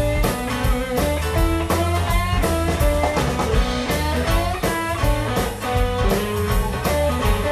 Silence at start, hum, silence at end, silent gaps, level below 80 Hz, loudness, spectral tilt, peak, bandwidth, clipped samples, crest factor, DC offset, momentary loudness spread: 0 s; none; 0 s; none; -24 dBFS; -21 LUFS; -5 dB/octave; -6 dBFS; 14 kHz; under 0.1%; 14 dB; under 0.1%; 2 LU